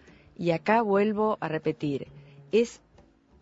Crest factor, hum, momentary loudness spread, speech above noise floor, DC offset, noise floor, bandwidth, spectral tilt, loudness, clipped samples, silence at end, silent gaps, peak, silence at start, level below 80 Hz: 20 dB; none; 9 LU; 33 dB; under 0.1%; -59 dBFS; 8 kHz; -6.5 dB/octave; -27 LUFS; under 0.1%; 0.65 s; none; -8 dBFS; 0.4 s; -64 dBFS